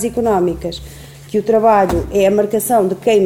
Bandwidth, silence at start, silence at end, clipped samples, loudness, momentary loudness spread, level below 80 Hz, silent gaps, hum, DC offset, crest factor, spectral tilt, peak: 17 kHz; 0 s; 0 s; under 0.1%; -15 LUFS; 13 LU; -36 dBFS; none; none; under 0.1%; 14 dB; -5.5 dB/octave; -2 dBFS